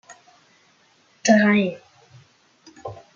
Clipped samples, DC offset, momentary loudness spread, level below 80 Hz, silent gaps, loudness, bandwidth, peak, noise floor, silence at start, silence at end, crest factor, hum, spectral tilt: under 0.1%; under 0.1%; 23 LU; -66 dBFS; none; -19 LUFS; 7.4 kHz; -4 dBFS; -59 dBFS; 1.25 s; 0.2 s; 22 dB; none; -5 dB/octave